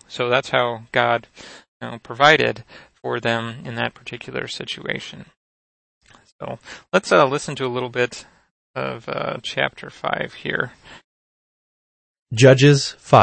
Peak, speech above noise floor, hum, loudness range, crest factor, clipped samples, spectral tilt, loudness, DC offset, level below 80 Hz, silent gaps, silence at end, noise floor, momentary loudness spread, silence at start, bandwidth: 0 dBFS; over 70 dB; none; 8 LU; 22 dB; under 0.1%; -5 dB/octave; -20 LUFS; under 0.1%; -58 dBFS; 1.68-1.80 s, 5.37-6.01 s, 6.32-6.39 s, 8.51-8.74 s, 11.04-12.14 s, 12.22-12.26 s; 0 s; under -90 dBFS; 20 LU; 0.1 s; 8.8 kHz